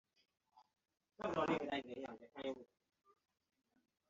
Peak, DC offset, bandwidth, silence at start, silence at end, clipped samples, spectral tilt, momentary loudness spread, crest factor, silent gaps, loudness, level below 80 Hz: -26 dBFS; under 0.1%; 7.6 kHz; 0.55 s; 1.45 s; under 0.1%; -3.5 dB/octave; 13 LU; 22 dB; none; -44 LUFS; -78 dBFS